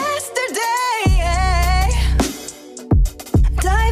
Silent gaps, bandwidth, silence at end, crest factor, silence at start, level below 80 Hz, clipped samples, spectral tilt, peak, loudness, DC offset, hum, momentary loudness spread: none; 16 kHz; 0 s; 14 dB; 0 s; -18 dBFS; under 0.1%; -4.5 dB/octave; -4 dBFS; -18 LUFS; under 0.1%; none; 5 LU